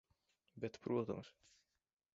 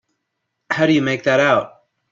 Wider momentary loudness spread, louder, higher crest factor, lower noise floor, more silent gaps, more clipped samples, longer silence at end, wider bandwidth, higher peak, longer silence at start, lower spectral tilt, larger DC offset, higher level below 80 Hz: about the same, 10 LU vs 9 LU; second, -44 LUFS vs -17 LUFS; about the same, 20 dB vs 16 dB; first, under -90 dBFS vs -76 dBFS; neither; neither; first, 0.85 s vs 0.45 s; about the same, 7.6 kHz vs 7.6 kHz; second, -26 dBFS vs -2 dBFS; second, 0.55 s vs 0.7 s; first, -7 dB/octave vs -5.5 dB/octave; neither; second, -78 dBFS vs -60 dBFS